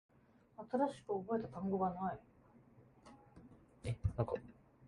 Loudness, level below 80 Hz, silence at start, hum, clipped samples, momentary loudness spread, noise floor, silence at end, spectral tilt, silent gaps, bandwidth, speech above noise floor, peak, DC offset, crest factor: -41 LUFS; -58 dBFS; 0.6 s; none; under 0.1%; 23 LU; -65 dBFS; 0 s; -8.5 dB/octave; none; 11 kHz; 26 dB; -22 dBFS; under 0.1%; 22 dB